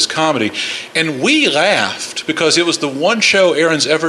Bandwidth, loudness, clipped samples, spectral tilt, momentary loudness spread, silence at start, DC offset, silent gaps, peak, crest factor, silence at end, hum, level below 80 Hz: 13 kHz; -13 LUFS; under 0.1%; -2.5 dB/octave; 7 LU; 0 s; under 0.1%; none; 0 dBFS; 14 dB; 0 s; none; -62 dBFS